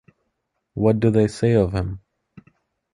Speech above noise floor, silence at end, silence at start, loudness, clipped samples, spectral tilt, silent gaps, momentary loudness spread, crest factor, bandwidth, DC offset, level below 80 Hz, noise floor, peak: 57 dB; 0.95 s; 0.75 s; -20 LUFS; under 0.1%; -8 dB/octave; none; 16 LU; 18 dB; 11 kHz; under 0.1%; -42 dBFS; -75 dBFS; -4 dBFS